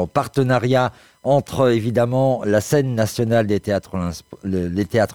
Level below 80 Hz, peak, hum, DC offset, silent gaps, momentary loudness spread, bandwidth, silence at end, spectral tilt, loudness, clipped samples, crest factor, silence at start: -48 dBFS; -4 dBFS; none; 0.2%; none; 9 LU; over 20 kHz; 0 s; -6.5 dB/octave; -19 LUFS; under 0.1%; 16 dB; 0 s